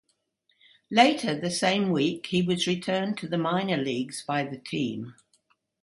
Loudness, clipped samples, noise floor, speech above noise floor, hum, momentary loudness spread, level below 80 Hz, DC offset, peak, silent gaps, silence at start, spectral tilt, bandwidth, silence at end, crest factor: -26 LUFS; under 0.1%; -72 dBFS; 46 dB; none; 10 LU; -68 dBFS; under 0.1%; -6 dBFS; none; 0.9 s; -5 dB/octave; 11.5 kHz; 0.7 s; 22 dB